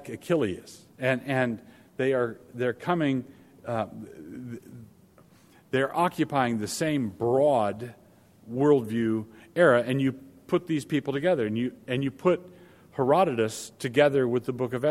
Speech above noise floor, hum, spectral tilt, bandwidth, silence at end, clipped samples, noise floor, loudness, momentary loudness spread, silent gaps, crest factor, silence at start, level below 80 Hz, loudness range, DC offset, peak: 31 dB; none; -6 dB/octave; 16 kHz; 0 s; under 0.1%; -57 dBFS; -27 LUFS; 17 LU; none; 20 dB; 0 s; -66 dBFS; 6 LU; under 0.1%; -6 dBFS